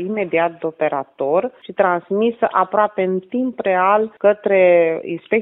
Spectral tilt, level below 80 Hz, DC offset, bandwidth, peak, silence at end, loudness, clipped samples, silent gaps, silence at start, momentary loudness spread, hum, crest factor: -10.5 dB/octave; -66 dBFS; under 0.1%; 4 kHz; -2 dBFS; 0 s; -18 LUFS; under 0.1%; none; 0 s; 8 LU; none; 16 dB